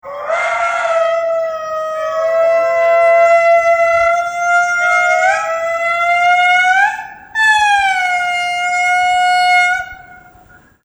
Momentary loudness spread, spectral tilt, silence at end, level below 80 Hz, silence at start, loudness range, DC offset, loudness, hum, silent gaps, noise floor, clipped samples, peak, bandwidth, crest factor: 9 LU; 0 dB/octave; 0.7 s; -52 dBFS; 0.05 s; 2 LU; under 0.1%; -13 LUFS; none; none; -45 dBFS; under 0.1%; -2 dBFS; over 20 kHz; 12 dB